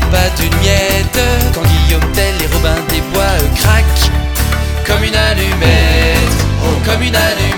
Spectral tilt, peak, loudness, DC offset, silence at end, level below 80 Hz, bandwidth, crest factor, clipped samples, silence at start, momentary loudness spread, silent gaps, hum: -4.5 dB/octave; 0 dBFS; -12 LUFS; 0.5%; 0 s; -14 dBFS; 20 kHz; 10 dB; under 0.1%; 0 s; 4 LU; none; none